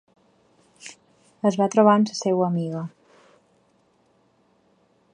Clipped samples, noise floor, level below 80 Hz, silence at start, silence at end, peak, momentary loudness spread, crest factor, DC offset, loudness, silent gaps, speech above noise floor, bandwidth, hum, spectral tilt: under 0.1%; -63 dBFS; -74 dBFS; 0.85 s; 2.25 s; -4 dBFS; 25 LU; 22 dB; under 0.1%; -21 LUFS; none; 43 dB; 10 kHz; none; -6.5 dB/octave